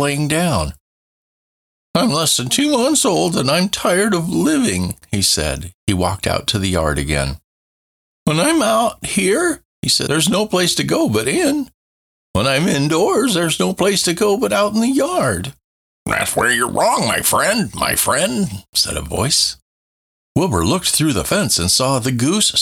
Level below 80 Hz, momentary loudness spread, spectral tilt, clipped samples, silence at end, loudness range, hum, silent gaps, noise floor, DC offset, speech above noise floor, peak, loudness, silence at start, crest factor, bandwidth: -38 dBFS; 7 LU; -3.5 dB/octave; under 0.1%; 0 s; 2 LU; none; 0.80-1.94 s, 5.74-5.87 s, 7.44-8.26 s, 9.65-9.83 s, 11.74-12.34 s, 15.64-16.06 s, 18.69-18.73 s, 19.62-20.35 s; under -90 dBFS; under 0.1%; over 74 dB; -4 dBFS; -16 LUFS; 0 s; 14 dB; 19.5 kHz